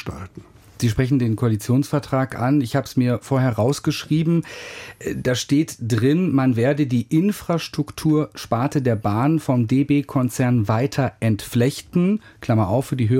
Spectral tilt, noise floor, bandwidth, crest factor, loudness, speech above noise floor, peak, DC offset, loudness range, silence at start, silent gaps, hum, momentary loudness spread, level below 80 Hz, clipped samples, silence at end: -7 dB/octave; -43 dBFS; 16.5 kHz; 14 dB; -21 LUFS; 24 dB; -6 dBFS; under 0.1%; 1 LU; 0 s; none; none; 6 LU; -48 dBFS; under 0.1%; 0 s